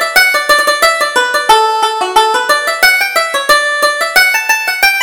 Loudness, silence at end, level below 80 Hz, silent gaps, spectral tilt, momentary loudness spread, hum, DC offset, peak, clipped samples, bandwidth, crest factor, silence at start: -9 LUFS; 0 s; -44 dBFS; none; 1 dB/octave; 4 LU; none; under 0.1%; 0 dBFS; 0.3%; over 20 kHz; 10 dB; 0 s